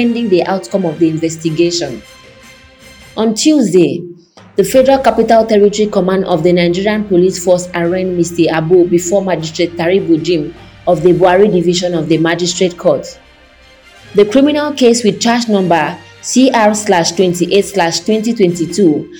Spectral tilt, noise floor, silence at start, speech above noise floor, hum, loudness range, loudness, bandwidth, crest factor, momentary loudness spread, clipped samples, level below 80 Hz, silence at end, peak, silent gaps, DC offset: -5 dB/octave; -42 dBFS; 0 s; 31 dB; none; 3 LU; -12 LUFS; 19.5 kHz; 12 dB; 8 LU; 0.2%; -44 dBFS; 0 s; 0 dBFS; none; under 0.1%